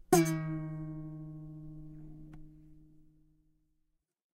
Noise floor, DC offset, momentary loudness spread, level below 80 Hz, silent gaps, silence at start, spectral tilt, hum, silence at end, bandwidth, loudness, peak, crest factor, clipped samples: -78 dBFS; under 0.1%; 25 LU; -58 dBFS; none; 0.1 s; -5.5 dB/octave; none; 1.35 s; 15.5 kHz; -35 LUFS; -12 dBFS; 26 dB; under 0.1%